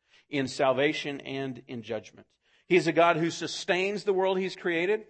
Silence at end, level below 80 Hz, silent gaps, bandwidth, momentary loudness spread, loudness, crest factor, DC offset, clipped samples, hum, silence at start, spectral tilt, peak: 0.05 s; -74 dBFS; none; 8.8 kHz; 13 LU; -28 LUFS; 20 dB; under 0.1%; under 0.1%; none; 0.3 s; -5 dB/octave; -8 dBFS